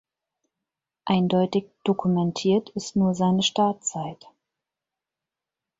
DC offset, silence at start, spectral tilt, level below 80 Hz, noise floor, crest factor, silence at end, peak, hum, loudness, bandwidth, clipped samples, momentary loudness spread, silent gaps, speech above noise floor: under 0.1%; 1.05 s; -5.5 dB/octave; -64 dBFS; -88 dBFS; 18 dB; 1.65 s; -8 dBFS; none; -24 LUFS; 7.8 kHz; under 0.1%; 8 LU; none; 65 dB